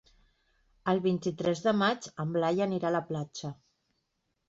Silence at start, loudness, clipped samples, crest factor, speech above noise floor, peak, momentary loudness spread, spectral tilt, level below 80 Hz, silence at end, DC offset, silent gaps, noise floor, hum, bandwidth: 0.85 s; -30 LUFS; under 0.1%; 18 dB; 50 dB; -14 dBFS; 10 LU; -6 dB/octave; -70 dBFS; 0.95 s; under 0.1%; none; -79 dBFS; none; 7.8 kHz